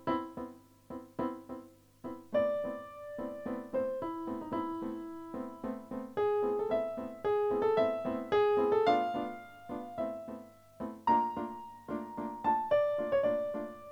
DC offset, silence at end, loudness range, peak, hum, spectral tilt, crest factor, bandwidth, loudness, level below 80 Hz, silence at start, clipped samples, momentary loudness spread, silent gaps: under 0.1%; 0 s; 7 LU; -16 dBFS; none; -6.5 dB/octave; 18 dB; 19.5 kHz; -34 LUFS; -66 dBFS; 0 s; under 0.1%; 16 LU; none